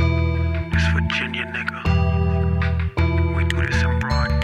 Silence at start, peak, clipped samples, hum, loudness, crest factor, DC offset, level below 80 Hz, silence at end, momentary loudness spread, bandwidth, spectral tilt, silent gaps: 0 s; -8 dBFS; under 0.1%; none; -21 LUFS; 12 dB; under 0.1%; -26 dBFS; 0 s; 4 LU; 8.6 kHz; -6.5 dB/octave; none